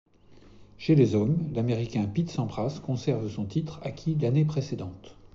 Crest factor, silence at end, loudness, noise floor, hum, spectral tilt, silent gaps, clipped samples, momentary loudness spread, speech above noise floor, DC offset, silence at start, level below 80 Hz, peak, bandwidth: 18 dB; 0.05 s; -28 LUFS; -53 dBFS; none; -8.5 dB/octave; none; under 0.1%; 12 LU; 26 dB; under 0.1%; 0.3 s; -56 dBFS; -8 dBFS; 7.4 kHz